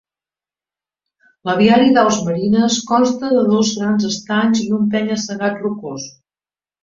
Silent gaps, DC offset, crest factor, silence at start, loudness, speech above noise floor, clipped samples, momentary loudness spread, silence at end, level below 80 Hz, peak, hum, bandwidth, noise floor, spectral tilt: none; under 0.1%; 16 dB; 1.45 s; -16 LUFS; over 75 dB; under 0.1%; 12 LU; 0.75 s; -56 dBFS; -2 dBFS; none; 7.6 kHz; under -90 dBFS; -5 dB/octave